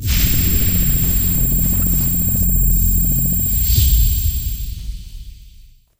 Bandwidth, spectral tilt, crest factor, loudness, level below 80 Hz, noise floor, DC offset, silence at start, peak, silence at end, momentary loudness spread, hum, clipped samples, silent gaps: 16.5 kHz; -4 dB/octave; 14 dB; -15 LUFS; -20 dBFS; -44 dBFS; under 0.1%; 0 s; -2 dBFS; 0.35 s; 11 LU; none; under 0.1%; none